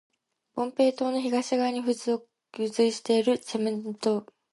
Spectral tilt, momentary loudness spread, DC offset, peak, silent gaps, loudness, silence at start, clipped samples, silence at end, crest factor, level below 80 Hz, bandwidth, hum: -4.5 dB/octave; 8 LU; under 0.1%; -12 dBFS; none; -27 LUFS; 0.55 s; under 0.1%; 0.3 s; 16 dB; -78 dBFS; 11.5 kHz; none